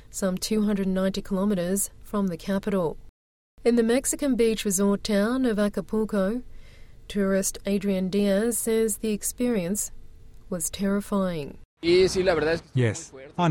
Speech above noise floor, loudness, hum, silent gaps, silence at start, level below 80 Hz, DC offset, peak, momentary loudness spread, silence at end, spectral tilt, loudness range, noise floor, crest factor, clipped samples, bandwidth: 20 dB; -25 LUFS; none; 3.09-3.57 s, 11.65-11.77 s; 0.1 s; -46 dBFS; under 0.1%; -10 dBFS; 7 LU; 0 s; -5 dB/octave; 2 LU; -45 dBFS; 16 dB; under 0.1%; 17 kHz